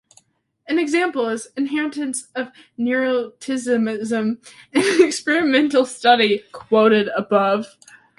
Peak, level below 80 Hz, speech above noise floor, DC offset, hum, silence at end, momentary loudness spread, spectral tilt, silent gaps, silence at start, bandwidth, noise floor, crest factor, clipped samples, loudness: -2 dBFS; -66 dBFS; 40 dB; under 0.1%; none; 0.5 s; 11 LU; -4 dB/octave; none; 0.7 s; 11.5 kHz; -59 dBFS; 18 dB; under 0.1%; -19 LUFS